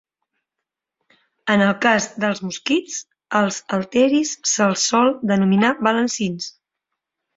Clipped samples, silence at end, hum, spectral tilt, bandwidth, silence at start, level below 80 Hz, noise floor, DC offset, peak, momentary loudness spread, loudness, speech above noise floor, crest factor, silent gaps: under 0.1%; 0.85 s; none; -4 dB/octave; 8 kHz; 1.45 s; -62 dBFS; -83 dBFS; under 0.1%; -2 dBFS; 9 LU; -19 LUFS; 64 dB; 20 dB; none